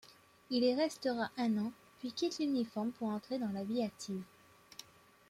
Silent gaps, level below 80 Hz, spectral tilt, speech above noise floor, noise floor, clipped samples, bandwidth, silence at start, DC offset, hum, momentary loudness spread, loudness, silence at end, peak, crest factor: none; -78 dBFS; -5 dB/octave; 22 dB; -57 dBFS; under 0.1%; 15.5 kHz; 0.05 s; under 0.1%; none; 18 LU; -37 LUFS; 0.45 s; -20 dBFS; 18 dB